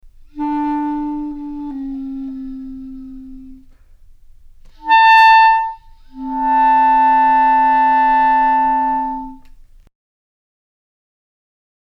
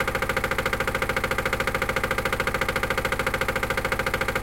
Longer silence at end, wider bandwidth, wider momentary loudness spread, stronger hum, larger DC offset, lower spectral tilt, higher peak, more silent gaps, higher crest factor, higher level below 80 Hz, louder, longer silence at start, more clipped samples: first, 2.55 s vs 0 s; second, 6.6 kHz vs 17 kHz; first, 22 LU vs 1 LU; neither; second, under 0.1% vs 0.6%; about the same, -3.5 dB/octave vs -4 dB/octave; first, -2 dBFS vs -8 dBFS; neither; about the same, 14 dB vs 16 dB; about the same, -42 dBFS vs -38 dBFS; first, -13 LUFS vs -25 LUFS; first, 0.35 s vs 0 s; neither